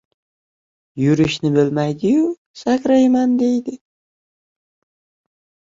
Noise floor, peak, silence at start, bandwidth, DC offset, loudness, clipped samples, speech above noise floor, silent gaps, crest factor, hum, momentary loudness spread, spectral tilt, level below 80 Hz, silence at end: under -90 dBFS; -4 dBFS; 0.95 s; 7.6 kHz; under 0.1%; -17 LUFS; under 0.1%; over 74 dB; 2.38-2.54 s; 16 dB; none; 9 LU; -7 dB/octave; -54 dBFS; 2 s